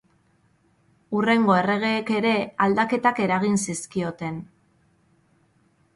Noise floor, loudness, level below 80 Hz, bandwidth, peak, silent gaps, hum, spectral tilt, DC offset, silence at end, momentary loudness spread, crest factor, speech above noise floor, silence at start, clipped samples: -63 dBFS; -22 LUFS; -64 dBFS; 11.5 kHz; -6 dBFS; none; none; -5 dB/octave; under 0.1%; 1.5 s; 10 LU; 18 dB; 41 dB; 1.1 s; under 0.1%